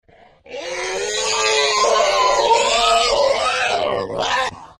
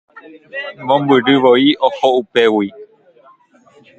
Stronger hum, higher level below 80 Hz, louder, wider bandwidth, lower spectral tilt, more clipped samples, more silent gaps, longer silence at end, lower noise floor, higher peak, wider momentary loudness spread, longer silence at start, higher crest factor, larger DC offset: neither; first, -46 dBFS vs -62 dBFS; second, -17 LUFS vs -13 LUFS; first, 14.5 kHz vs 8 kHz; second, -0.5 dB/octave vs -6 dB/octave; neither; neither; second, 0.1 s vs 1.15 s; second, -45 dBFS vs -49 dBFS; second, -4 dBFS vs 0 dBFS; second, 9 LU vs 15 LU; about the same, 0.45 s vs 0.55 s; about the same, 14 dB vs 16 dB; neither